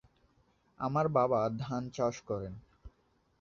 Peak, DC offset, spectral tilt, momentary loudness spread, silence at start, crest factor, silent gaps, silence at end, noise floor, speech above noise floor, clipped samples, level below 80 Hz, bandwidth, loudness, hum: -16 dBFS; under 0.1%; -7 dB/octave; 11 LU; 0.8 s; 20 dB; none; 0.5 s; -72 dBFS; 40 dB; under 0.1%; -62 dBFS; 7.4 kHz; -33 LUFS; none